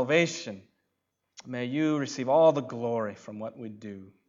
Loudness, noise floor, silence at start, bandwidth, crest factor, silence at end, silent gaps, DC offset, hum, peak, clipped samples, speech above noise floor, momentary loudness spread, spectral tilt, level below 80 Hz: -27 LUFS; -81 dBFS; 0 s; 7.6 kHz; 18 dB; 0.2 s; none; under 0.1%; none; -10 dBFS; under 0.1%; 52 dB; 20 LU; -5.5 dB/octave; -82 dBFS